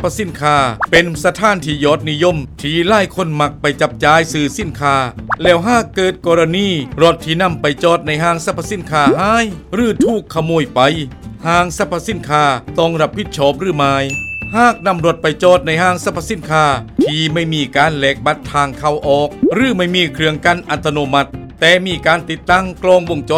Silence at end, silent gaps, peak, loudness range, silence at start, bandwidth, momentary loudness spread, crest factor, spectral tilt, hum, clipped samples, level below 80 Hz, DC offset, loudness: 0 s; none; 0 dBFS; 1 LU; 0 s; 16 kHz; 6 LU; 14 dB; -5 dB/octave; none; under 0.1%; -38 dBFS; under 0.1%; -14 LUFS